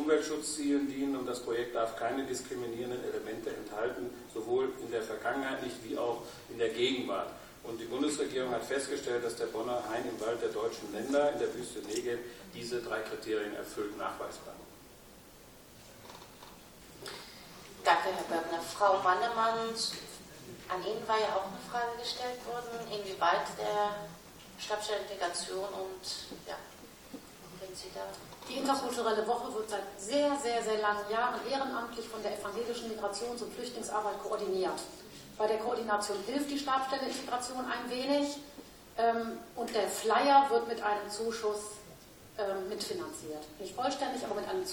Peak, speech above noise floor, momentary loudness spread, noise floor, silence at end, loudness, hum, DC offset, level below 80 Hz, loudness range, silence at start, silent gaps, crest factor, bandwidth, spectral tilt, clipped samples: -12 dBFS; 21 dB; 18 LU; -55 dBFS; 0 s; -34 LUFS; none; under 0.1%; -66 dBFS; 8 LU; 0 s; none; 22 dB; 19 kHz; -3 dB/octave; under 0.1%